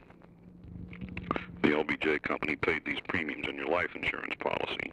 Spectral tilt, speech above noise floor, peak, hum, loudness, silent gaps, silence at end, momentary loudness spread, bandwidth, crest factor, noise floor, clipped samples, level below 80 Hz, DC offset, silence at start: -6 dB/octave; 22 dB; -12 dBFS; none; -32 LUFS; none; 0 s; 13 LU; 10.5 kHz; 22 dB; -54 dBFS; under 0.1%; -56 dBFS; under 0.1%; 0 s